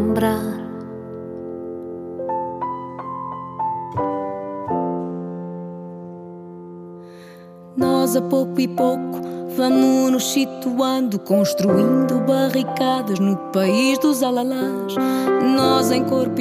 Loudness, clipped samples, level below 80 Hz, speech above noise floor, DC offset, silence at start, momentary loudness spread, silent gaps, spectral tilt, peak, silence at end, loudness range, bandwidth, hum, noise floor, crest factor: -20 LUFS; under 0.1%; -64 dBFS; 23 dB; under 0.1%; 0 s; 17 LU; none; -5.5 dB/octave; -2 dBFS; 0 s; 10 LU; 15.5 kHz; none; -41 dBFS; 18 dB